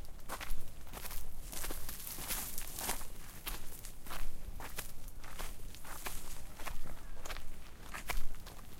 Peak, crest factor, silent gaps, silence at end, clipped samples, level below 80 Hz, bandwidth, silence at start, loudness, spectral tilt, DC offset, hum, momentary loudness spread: -16 dBFS; 18 dB; none; 0 s; under 0.1%; -42 dBFS; 17 kHz; 0 s; -45 LUFS; -2.5 dB/octave; under 0.1%; none; 11 LU